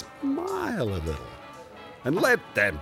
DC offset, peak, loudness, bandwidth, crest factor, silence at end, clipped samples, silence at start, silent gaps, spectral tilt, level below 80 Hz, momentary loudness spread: under 0.1%; -8 dBFS; -27 LUFS; 16 kHz; 20 dB; 0 s; under 0.1%; 0 s; none; -5.5 dB/octave; -48 dBFS; 21 LU